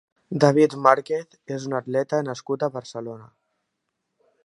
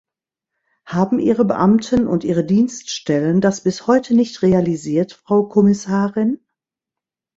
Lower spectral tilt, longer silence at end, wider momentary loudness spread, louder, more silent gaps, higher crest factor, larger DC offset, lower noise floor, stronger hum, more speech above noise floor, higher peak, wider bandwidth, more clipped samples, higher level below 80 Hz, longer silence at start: about the same, -6.5 dB/octave vs -6.5 dB/octave; first, 1.2 s vs 1 s; first, 17 LU vs 6 LU; second, -22 LUFS vs -17 LUFS; neither; first, 24 dB vs 16 dB; neither; second, -78 dBFS vs -86 dBFS; neither; second, 56 dB vs 70 dB; about the same, 0 dBFS vs 0 dBFS; first, 11.5 kHz vs 8 kHz; neither; second, -74 dBFS vs -52 dBFS; second, 0.3 s vs 0.85 s